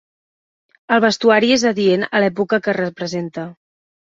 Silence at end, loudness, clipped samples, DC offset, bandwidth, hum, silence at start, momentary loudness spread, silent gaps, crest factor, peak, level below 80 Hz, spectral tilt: 0.6 s; -16 LUFS; under 0.1%; under 0.1%; 8 kHz; none; 0.9 s; 12 LU; none; 16 dB; -2 dBFS; -60 dBFS; -4.5 dB/octave